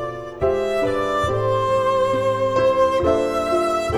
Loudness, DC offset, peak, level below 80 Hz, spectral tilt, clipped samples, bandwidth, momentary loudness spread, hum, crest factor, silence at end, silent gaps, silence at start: -20 LUFS; under 0.1%; -6 dBFS; -42 dBFS; -6 dB/octave; under 0.1%; 13 kHz; 4 LU; none; 14 dB; 0 s; none; 0 s